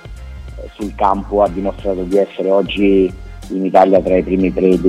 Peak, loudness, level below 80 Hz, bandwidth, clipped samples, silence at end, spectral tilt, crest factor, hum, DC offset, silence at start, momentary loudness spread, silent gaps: 0 dBFS; -15 LUFS; -32 dBFS; 11.5 kHz; under 0.1%; 0 s; -7.5 dB/octave; 14 dB; none; under 0.1%; 0.05 s; 21 LU; none